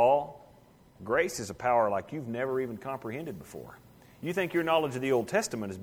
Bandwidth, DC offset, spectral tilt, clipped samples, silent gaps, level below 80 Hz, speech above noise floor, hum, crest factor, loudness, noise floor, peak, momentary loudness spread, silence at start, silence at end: over 20 kHz; under 0.1%; -5 dB/octave; under 0.1%; none; -64 dBFS; 27 dB; none; 18 dB; -30 LUFS; -58 dBFS; -12 dBFS; 16 LU; 0 s; 0 s